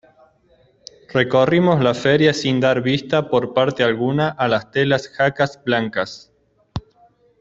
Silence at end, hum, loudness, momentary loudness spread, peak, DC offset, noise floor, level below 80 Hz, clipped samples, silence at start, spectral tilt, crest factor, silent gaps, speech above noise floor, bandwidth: 0.6 s; none; -18 LUFS; 11 LU; -2 dBFS; under 0.1%; -57 dBFS; -52 dBFS; under 0.1%; 1.1 s; -6 dB/octave; 16 dB; none; 39 dB; 7.8 kHz